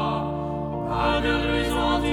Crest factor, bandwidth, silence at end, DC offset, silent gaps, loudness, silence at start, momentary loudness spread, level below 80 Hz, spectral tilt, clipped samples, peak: 14 dB; 18 kHz; 0 s; under 0.1%; none; -24 LUFS; 0 s; 6 LU; -34 dBFS; -6 dB/octave; under 0.1%; -10 dBFS